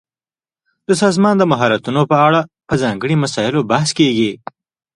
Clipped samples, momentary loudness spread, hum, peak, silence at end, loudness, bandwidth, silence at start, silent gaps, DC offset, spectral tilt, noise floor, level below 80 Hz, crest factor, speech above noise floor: under 0.1%; 7 LU; none; 0 dBFS; 0.6 s; -15 LUFS; 11.5 kHz; 0.9 s; none; under 0.1%; -5.5 dB/octave; under -90 dBFS; -52 dBFS; 16 dB; over 76 dB